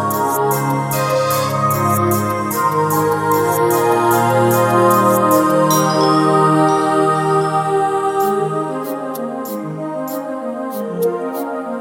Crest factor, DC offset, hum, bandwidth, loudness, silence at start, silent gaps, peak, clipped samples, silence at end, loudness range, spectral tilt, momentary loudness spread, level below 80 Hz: 14 dB; under 0.1%; none; 17 kHz; -16 LUFS; 0 s; none; -2 dBFS; under 0.1%; 0 s; 8 LU; -5.5 dB/octave; 11 LU; -56 dBFS